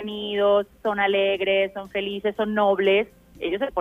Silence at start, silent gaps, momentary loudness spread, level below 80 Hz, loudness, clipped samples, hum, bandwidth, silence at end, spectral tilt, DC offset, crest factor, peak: 0 s; none; 9 LU; -56 dBFS; -23 LUFS; under 0.1%; none; 4.5 kHz; 0 s; -6 dB/octave; under 0.1%; 14 dB; -10 dBFS